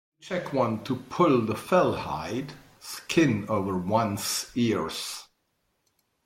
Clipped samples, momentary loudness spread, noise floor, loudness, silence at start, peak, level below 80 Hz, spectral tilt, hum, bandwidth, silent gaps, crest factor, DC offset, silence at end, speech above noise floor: under 0.1%; 12 LU; -75 dBFS; -27 LUFS; 0.25 s; -8 dBFS; -60 dBFS; -5 dB/octave; none; 16.5 kHz; none; 18 dB; under 0.1%; 1 s; 48 dB